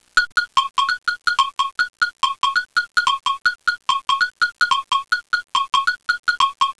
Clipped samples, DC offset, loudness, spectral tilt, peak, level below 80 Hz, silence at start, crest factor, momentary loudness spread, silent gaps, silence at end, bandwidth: under 0.1%; 0.3%; -19 LUFS; 2 dB/octave; -6 dBFS; -56 dBFS; 0.15 s; 14 dB; 3 LU; 6.19-6.23 s; 0.05 s; 11 kHz